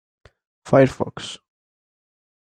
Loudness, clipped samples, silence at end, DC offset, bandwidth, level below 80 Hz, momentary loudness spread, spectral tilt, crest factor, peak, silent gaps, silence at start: -19 LUFS; under 0.1%; 1.1 s; under 0.1%; 10 kHz; -56 dBFS; 18 LU; -6.5 dB/octave; 22 dB; -2 dBFS; none; 0.65 s